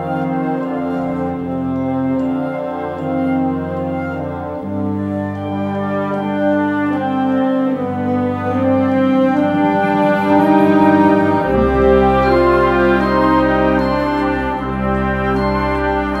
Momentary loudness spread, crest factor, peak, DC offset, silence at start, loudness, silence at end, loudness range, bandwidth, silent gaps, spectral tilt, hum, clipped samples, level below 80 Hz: 9 LU; 14 dB; 0 dBFS; under 0.1%; 0 s; -16 LUFS; 0 s; 8 LU; 12 kHz; none; -8.5 dB/octave; none; under 0.1%; -32 dBFS